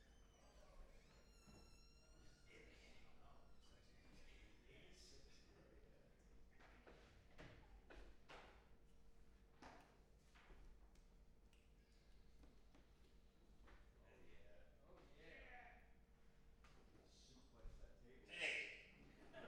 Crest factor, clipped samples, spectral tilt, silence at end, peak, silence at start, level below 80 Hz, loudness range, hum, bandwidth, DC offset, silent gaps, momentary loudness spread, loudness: 28 dB; under 0.1%; -3 dB/octave; 0 s; -34 dBFS; 0 s; -70 dBFS; 15 LU; none; 11 kHz; under 0.1%; none; 20 LU; -56 LUFS